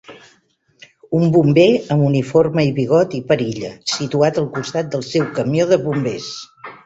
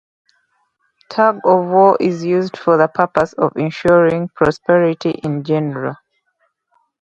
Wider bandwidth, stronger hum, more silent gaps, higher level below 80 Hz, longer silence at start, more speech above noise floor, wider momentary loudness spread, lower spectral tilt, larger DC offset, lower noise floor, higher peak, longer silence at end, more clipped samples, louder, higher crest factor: about the same, 8 kHz vs 8 kHz; neither; neither; about the same, -54 dBFS vs -52 dBFS; second, 0.1 s vs 1.1 s; second, 42 dB vs 51 dB; about the same, 11 LU vs 9 LU; about the same, -6.5 dB/octave vs -7.5 dB/octave; neither; second, -58 dBFS vs -66 dBFS; about the same, -2 dBFS vs 0 dBFS; second, 0.1 s vs 1.1 s; neither; about the same, -17 LUFS vs -15 LUFS; about the same, 16 dB vs 16 dB